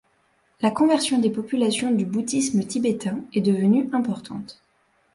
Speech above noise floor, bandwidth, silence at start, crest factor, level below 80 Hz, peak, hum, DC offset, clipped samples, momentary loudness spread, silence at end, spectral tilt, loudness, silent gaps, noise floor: 43 dB; 11.5 kHz; 0.6 s; 16 dB; -64 dBFS; -6 dBFS; none; under 0.1%; under 0.1%; 9 LU; 0.6 s; -5 dB/octave; -22 LUFS; none; -65 dBFS